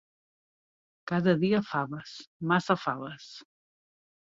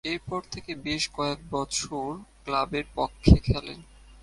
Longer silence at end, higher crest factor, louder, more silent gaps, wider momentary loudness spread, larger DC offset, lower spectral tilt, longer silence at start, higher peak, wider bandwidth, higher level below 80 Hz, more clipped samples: first, 0.9 s vs 0.4 s; about the same, 22 dB vs 24 dB; about the same, -29 LUFS vs -27 LUFS; first, 2.27-2.40 s vs none; first, 20 LU vs 16 LU; neither; first, -7 dB/octave vs -5 dB/octave; first, 1.05 s vs 0.05 s; second, -10 dBFS vs -2 dBFS; second, 7.6 kHz vs 11.5 kHz; second, -70 dBFS vs -34 dBFS; neither